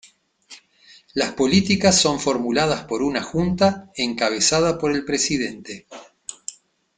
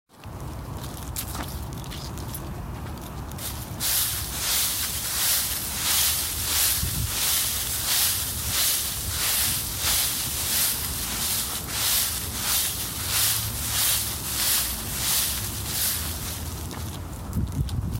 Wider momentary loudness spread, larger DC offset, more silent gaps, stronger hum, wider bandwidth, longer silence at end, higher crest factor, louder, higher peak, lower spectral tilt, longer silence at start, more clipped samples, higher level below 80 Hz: first, 19 LU vs 14 LU; neither; neither; neither; second, 9.6 kHz vs 17 kHz; first, 0.45 s vs 0 s; about the same, 20 dB vs 18 dB; first, -20 LUFS vs -23 LUFS; first, -2 dBFS vs -8 dBFS; first, -3.5 dB/octave vs -1.5 dB/octave; first, 0.5 s vs 0.15 s; neither; second, -50 dBFS vs -40 dBFS